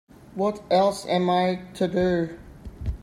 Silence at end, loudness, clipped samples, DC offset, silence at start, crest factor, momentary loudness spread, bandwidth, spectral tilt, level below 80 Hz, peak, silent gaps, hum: 0.05 s; -24 LUFS; under 0.1%; under 0.1%; 0.35 s; 16 dB; 16 LU; 15 kHz; -6.5 dB/octave; -42 dBFS; -10 dBFS; none; none